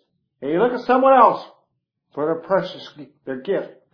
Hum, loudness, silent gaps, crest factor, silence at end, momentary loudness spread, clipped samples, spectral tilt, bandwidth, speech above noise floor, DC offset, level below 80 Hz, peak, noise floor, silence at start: none; -19 LUFS; none; 20 dB; 0.25 s; 23 LU; under 0.1%; -7.5 dB/octave; 5.4 kHz; 53 dB; under 0.1%; -66 dBFS; 0 dBFS; -72 dBFS; 0.4 s